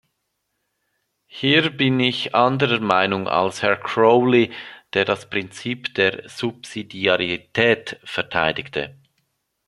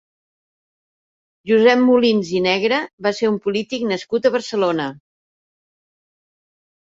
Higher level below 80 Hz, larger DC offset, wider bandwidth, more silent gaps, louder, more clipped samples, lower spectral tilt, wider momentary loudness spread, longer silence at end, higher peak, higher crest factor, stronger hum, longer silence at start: about the same, -60 dBFS vs -64 dBFS; neither; first, 12 kHz vs 7.8 kHz; second, none vs 2.93-2.98 s; about the same, -20 LUFS vs -18 LUFS; neither; about the same, -5.5 dB/octave vs -5 dB/octave; first, 12 LU vs 9 LU; second, 0.75 s vs 1.95 s; about the same, 0 dBFS vs -2 dBFS; about the same, 20 dB vs 18 dB; neither; about the same, 1.35 s vs 1.45 s